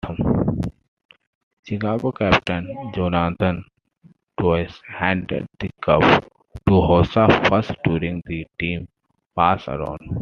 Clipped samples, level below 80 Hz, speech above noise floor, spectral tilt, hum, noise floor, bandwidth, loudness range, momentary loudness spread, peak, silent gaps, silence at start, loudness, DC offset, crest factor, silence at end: under 0.1%; -42 dBFS; 35 dB; -7.5 dB/octave; none; -54 dBFS; 7 kHz; 5 LU; 14 LU; -2 dBFS; 0.88-0.97 s, 1.05-1.09 s, 1.27-1.63 s, 9.26-9.30 s; 0.05 s; -20 LUFS; under 0.1%; 20 dB; 0 s